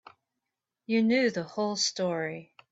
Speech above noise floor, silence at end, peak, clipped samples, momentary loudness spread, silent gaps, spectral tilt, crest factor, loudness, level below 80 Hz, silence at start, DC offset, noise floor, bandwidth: 58 dB; 0.25 s; -14 dBFS; under 0.1%; 10 LU; none; -3.5 dB/octave; 16 dB; -28 LUFS; -76 dBFS; 0.9 s; under 0.1%; -86 dBFS; 8 kHz